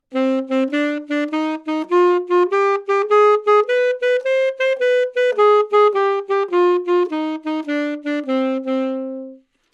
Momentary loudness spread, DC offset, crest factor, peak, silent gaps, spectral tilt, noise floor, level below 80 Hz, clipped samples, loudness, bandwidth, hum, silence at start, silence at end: 9 LU; under 0.1%; 14 dB; -4 dBFS; none; -3.5 dB/octave; -40 dBFS; -78 dBFS; under 0.1%; -18 LUFS; 8.4 kHz; none; 0.1 s; 0.35 s